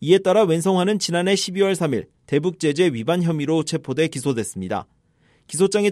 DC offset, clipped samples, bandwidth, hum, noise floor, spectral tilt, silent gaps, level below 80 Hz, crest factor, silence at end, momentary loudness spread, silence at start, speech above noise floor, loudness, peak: under 0.1%; under 0.1%; 14.5 kHz; none; -60 dBFS; -5 dB/octave; none; -62 dBFS; 16 dB; 0 s; 9 LU; 0 s; 40 dB; -21 LUFS; -4 dBFS